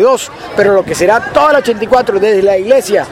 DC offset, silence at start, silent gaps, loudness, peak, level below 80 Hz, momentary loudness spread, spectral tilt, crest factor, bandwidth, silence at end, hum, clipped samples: under 0.1%; 0 s; none; -10 LUFS; 0 dBFS; -42 dBFS; 3 LU; -4 dB/octave; 10 dB; 16 kHz; 0 s; none; 0.1%